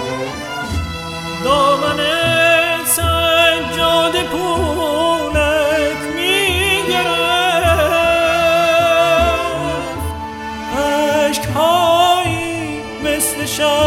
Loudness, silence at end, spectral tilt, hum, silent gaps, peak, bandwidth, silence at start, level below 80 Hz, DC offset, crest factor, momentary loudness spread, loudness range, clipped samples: -15 LUFS; 0 s; -3.5 dB/octave; none; none; 0 dBFS; 17 kHz; 0 s; -34 dBFS; under 0.1%; 14 dB; 11 LU; 3 LU; under 0.1%